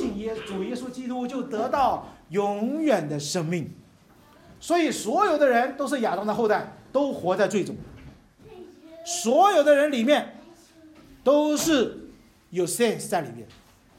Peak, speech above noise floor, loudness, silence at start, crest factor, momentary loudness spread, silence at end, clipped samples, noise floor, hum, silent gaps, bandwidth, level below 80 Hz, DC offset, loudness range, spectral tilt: -6 dBFS; 31 dB; -24 LUFS; 0 s; 18 dB; 13 LU; 0.5 s; under 0.1%; -54 dBFS; none; none; 16 kHz; -58 dBFS; under 0.1%; 5 LU; -4.5 dB/octave